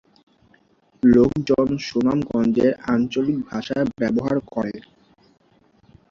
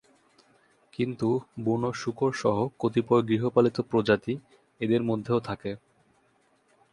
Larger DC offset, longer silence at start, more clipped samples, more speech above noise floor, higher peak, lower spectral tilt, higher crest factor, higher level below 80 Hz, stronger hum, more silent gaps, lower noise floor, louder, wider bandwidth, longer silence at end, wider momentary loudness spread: neither; about the same, 1.05 s vs 1 s; neither; about the same, 39 dB vs 40 dB; first, -4 dBFS vs -8 dBFS; about the same, -7.5 dB/octave vs -7 dB/octave; about the same, 18 dB vs 20 dB; first, -50 dBFS vs -62 dBFS; neither; neither; second, -58 dBFS vs -67 dBFS; first, -21 LUFS vs -27 LUFS; second, 7.2 kHz vs 11 kHz; first, 1.3 s vs 1.15 s; about the same, 10 LU vs 11 LU